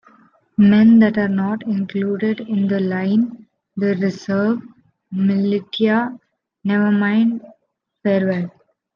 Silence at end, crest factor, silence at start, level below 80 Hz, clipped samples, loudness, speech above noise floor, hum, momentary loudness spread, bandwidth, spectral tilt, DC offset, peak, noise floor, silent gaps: 0.45 s; 14 dB; 0.6 s; -62 dBFS; under 0.1%; -18 LUFS; 52 dB; none; 13 LU; 6.6 kHz; -8.5 dB/octave; under 0.1%; -4 dBFS; -69 dBFS; none